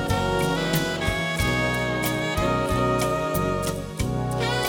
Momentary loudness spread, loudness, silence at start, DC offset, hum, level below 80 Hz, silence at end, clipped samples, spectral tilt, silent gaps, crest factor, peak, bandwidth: 4 LU; -24 LUFS; 0 s; under 0.1%; none; -36 dBFS; 0 s; under 0.1%; -5 dB/octave; none; 16 dB; -8 dBFS; 19 kHz